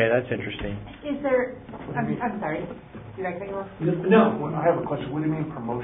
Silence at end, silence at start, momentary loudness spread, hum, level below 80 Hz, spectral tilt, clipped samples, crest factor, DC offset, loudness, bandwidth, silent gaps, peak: 0 s; 0 s; 14 LU; none; -50 dBFS; -11.5 dB/octave; under 0.1%; 20 dB; under 0.1%; -26 LUFS; 3.9 kHz; none; -6 dBFS